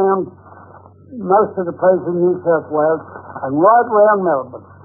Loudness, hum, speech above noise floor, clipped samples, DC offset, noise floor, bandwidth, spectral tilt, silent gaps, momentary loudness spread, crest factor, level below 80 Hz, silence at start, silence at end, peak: -15 LUFS; none; 26 dB; under 0.1%; under 0.1%; -42 dBFS; 1.6 kHz; -16 dB/octave; none; 17 LU; 14 dB; -62 dBFS; 0 s; 0.25 s; -2 dBFS